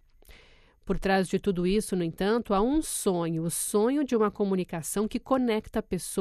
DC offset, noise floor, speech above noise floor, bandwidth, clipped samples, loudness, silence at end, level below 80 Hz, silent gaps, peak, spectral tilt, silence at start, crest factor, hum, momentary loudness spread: under 0.1%; -57 dBFS; 30 dB; 14.5 kHz; under 0.1%; -28 LUFS; 0 s; -46 dBFS; none; -12 dBFS; -5 dB/octave; 0.3 s; 16 dB; none; 6 LU